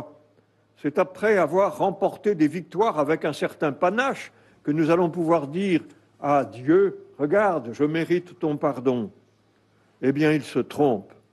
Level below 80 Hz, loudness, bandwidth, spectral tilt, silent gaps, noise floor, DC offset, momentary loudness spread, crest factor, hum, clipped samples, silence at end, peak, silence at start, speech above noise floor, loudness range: -66 dBFS; -24 LUFS; 12.5 kHz; -7 dB/octave; none; -62 dBFS; under 0.1%; 8 LU; 14 dB; none; under 0.1%; 0.3 s; -10 dBFS; 0 s; 40 dB; 2 LU